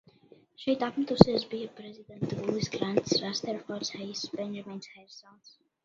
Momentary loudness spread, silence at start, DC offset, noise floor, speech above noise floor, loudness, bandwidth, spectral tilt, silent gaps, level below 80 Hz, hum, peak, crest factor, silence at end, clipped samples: 25 LU; 0.6 s; under 0.1%; -59 dBFS; 29 dB; -30 LUFS; 7.6 kHz; -5.5 dB/octave; none; -54 dBFS; none; 0 dBFS; 30 dB; 0.35 s; under 0.1%